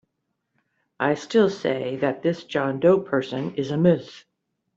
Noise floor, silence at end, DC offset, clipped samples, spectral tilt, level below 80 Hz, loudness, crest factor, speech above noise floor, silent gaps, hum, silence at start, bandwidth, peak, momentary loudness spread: -77 dBFS; 0.55 s; under 0.1%; under 0.1%; -7 dB/octave; -66 dBFS; -23 LUFS; 18 dB; 55 dB; none; none; 1 s; 7.8 kHz; -6 dBFS; 7 LU